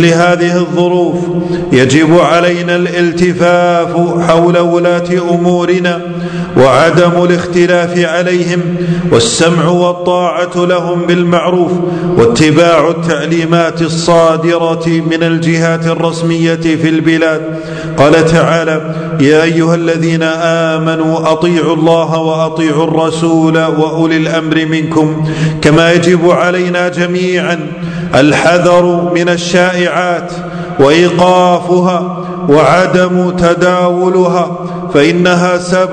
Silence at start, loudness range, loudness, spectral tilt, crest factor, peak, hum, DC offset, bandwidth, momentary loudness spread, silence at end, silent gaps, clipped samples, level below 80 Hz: 0 s; 1 LU; -10 LUFS; -6 dB/octave; 10 dB; 0 dBFS; none; under 0.1%; 11 kHz; 6 LU; 0 s; none; 2%; -42 dBFS